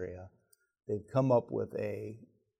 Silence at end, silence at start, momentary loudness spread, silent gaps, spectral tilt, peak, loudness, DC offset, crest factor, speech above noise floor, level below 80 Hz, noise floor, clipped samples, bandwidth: 0.35 s; 0 s; 22 LU; none; -9 dB/octave; -16 dBFS; -34 LUFS; under 0.1%; 20 dB; 39 dB; -70 dBFS; -71 dBFS; under 0.1%; 12.5 kHz